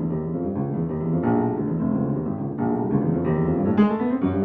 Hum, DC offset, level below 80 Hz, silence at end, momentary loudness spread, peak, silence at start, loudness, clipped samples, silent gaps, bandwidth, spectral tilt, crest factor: none; under 0.1%; -48 dBFS; 0 s; 6 LU; -6 dBFS; 0 s; -23 LUFS; under 0.1%; none; 3.8 kHz; -12 dB/octave; 16 dB